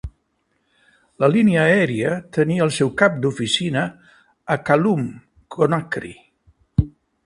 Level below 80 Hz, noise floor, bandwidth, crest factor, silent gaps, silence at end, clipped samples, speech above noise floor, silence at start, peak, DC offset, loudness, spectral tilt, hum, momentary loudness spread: -42 dBFS; -69 dBFS; 11.5 kHz; 20 dB; none; 0.35 s; under 0.1%; 50 dB; 0.05 s; 0 dBFS; under 0.1%; -19 LUFS; -6 dB/octave; none; 14 LU